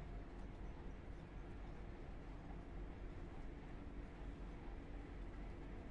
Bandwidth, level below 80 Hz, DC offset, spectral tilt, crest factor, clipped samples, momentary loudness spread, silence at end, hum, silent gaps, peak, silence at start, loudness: 8.2 kHz; -54 dBFS; under 0.1%; -7.5 dB/octave; 12 dB; under 0.1%; 1 LU; 0 s; none; none; -40 dBFS; 0 s; -55 LUFS